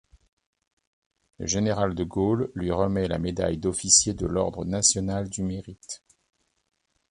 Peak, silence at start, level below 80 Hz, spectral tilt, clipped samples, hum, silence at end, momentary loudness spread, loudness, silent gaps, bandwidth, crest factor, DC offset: -4 dBFS; 1.4 s; -46 dBFS; -3.5 dB/octave; under 0.1%; none; 1.15 s; 17 LU; -24 LUFS; none; 11.5 kHz; 24 dB; under 0.1%